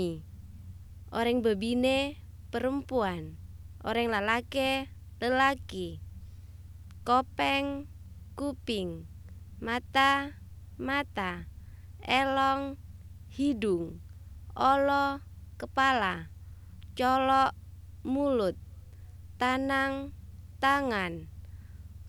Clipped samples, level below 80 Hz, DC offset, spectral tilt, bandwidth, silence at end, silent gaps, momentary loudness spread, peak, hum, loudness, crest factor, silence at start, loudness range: under 0.1%; -50 dBFS; under 0.1%; -5 dB/octave; 18.5 kHz; 0 s; none; 23 LU; -12 dBFS; none; -29 LUFS; 20 dB; 0 s; 3 LU